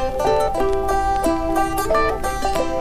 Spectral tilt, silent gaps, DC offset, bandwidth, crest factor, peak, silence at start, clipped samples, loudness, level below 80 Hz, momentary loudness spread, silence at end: -5 dB/octave; none; 0.8%; 15.5 kHz; 12 dB; -6 dBFS; 0 s; under 0.1%; -20 LUFS; -30 dBFS; 3 LU; 0 s